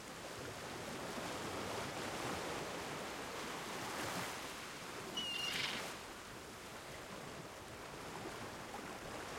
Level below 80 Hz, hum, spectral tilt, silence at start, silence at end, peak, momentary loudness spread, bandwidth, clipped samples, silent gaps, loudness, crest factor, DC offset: -68 dBFS; none; -2.5 dB/octave; 0 s; 0 s; -26 dBFS; 10 LU; 16.5 kHz; under 0.1%; none; -44 LUFS; 20 dB; under 0.1%